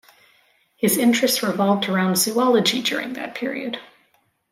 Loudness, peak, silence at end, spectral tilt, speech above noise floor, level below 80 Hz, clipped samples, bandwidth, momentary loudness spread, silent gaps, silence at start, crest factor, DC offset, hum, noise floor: -20 LUFS; -4 dBFS; 0.65 s; -3.5 dB/octave; 44 dB; -70 dBFS; under 0.1%; 16 kHz; 11 LU; none; 0.8 s; 18 dB; under 0.1%; none; -64 dBFS